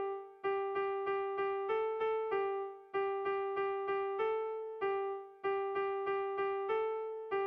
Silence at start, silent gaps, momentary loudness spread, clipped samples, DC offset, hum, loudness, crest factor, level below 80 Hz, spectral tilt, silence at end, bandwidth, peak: 0 s; none; 5 LU; under 0.1%; under 0.1%; none; -37 LUFS; 12 dB; -74 dBFS; -6.5 dB/octave; 0 s; 4.8 kHz; -26 dBFS